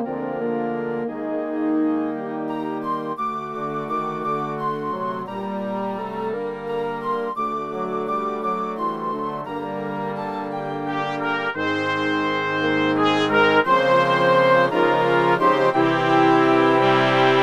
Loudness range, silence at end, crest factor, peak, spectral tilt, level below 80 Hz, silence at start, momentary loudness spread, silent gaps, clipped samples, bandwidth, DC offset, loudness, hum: 9 LU; 0 s; 18 dB; -4 dBFS; -6 dB/octave; -62 dBFS; 0 s; 11 LU; none; under 0.1%; 12 kHz; under 0.1%; -21 LUFS; none